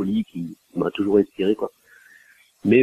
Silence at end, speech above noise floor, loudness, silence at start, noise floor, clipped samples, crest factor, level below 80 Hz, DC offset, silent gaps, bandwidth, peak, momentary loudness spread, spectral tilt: 0 s; 32 dB; -23 LUFS; 0 s; -54 dBFS; under 0.1%; 18 dB; -60 dBFS; under 0.1%; none; 13.5 kHz; -4 dBFS; 12 LU; -8 dB/octave